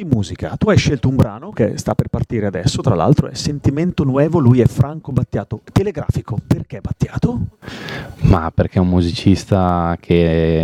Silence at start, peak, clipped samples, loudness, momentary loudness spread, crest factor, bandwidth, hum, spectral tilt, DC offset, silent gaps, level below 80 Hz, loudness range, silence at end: 0 s; 0 dBFS; under 0.1%; -17 LUFS; 9 LU; 16 dB; 13 kHz; none; -7 dB/octave; under 0.1%; none; -32 dBFS; 4 LU; 0 s